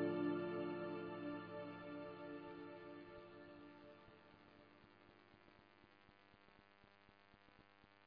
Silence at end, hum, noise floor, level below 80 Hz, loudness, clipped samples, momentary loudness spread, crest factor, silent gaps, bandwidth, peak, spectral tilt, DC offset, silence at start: 0 s; none; -70 dBFS; -82 dBFS; -49 LUFS; under 0.1%; 24 LU; 20 dB; none; 5 kHz; -32 dBFS; -5.5 dB/octave; under 0.1%; 0 s